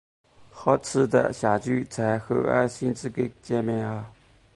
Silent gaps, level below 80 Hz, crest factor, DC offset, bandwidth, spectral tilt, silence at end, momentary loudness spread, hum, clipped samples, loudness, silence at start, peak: none; -58 dBFS; 20 dB; under 0.1%; 11.5 kHz; -6.5 dB/octave; 0.45 s; 8 LU; none; under 0.1%; -25 LUFS; 0.4 s; -6 dBFS